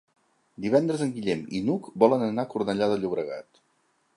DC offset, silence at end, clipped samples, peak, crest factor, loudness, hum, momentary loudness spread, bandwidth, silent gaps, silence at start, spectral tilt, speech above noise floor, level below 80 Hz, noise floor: under 0.1%; 0.75 s; under 0.1%; -4 dBFS; 22 dB; -26 LUFS; none; 10 LU; 11.5 kHz; none; 0.6 s; -7 dB/octave; 44 dB; -66 dBFS; -69 dBFS